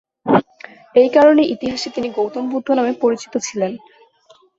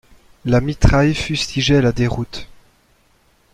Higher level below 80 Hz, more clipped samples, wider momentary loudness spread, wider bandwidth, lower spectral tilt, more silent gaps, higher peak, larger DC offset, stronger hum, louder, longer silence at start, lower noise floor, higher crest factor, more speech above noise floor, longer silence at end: second, -58 dBFS vs -28 dBFS; neither; about the same, 12 LU vs 14 LU; second, 7.8 kHz vs 11.5 kHz; about the same, -5 dB/octave vs -6 dB/octave; neither; about the same, -2 dBFS vs -2 dBFS; neither; neither; about the same, -17 LUFS vs -17 LUFS; second, 0.25 s vs 0.45 s; second, -52 dBFS vs -57 dBFS; about the same, 16 dB vs 16 dB; second, 36 dB vs 41 dB; second, 0.8 s vs 1.1 s